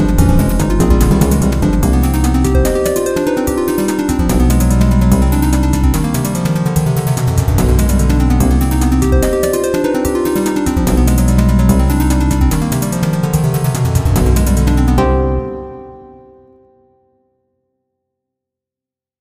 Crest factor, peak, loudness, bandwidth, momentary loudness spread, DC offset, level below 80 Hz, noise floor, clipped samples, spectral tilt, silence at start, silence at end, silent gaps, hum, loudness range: 12 dB; 0 dBFS; -13 LUFS; 15.5 kHz; 4 LU; under 0.1%; -16 dBFS; -88 dBFS; under 0.1%; -6.5 dB/octave; 0 s; 3.15 s; none; none; 3 LU